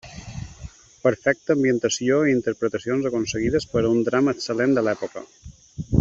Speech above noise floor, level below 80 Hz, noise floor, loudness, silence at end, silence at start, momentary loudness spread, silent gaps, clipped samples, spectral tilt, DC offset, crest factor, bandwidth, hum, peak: 20 dB; -46 dBFS; -42 dBFS; -22 LUFS; 0 s; 0.05 s; 17 LU; none; under 0.1%; -5.5 dB/octave; under 0.1%; 18 dB; 8 kHz; none; -4 dBFS